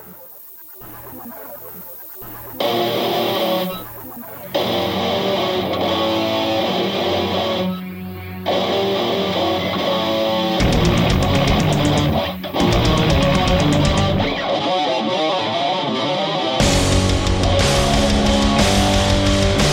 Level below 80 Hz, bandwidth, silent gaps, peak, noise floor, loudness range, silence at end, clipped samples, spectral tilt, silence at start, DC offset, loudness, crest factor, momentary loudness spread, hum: -28 dBFS; 17 kHz; none; -2 dBFS; -39 dBFS; 6 LU; 0 s; under 0.1%; -5 dB/octave; 0 s; under 0.1%; -18 LUFS; 16 dB; 16 LU; none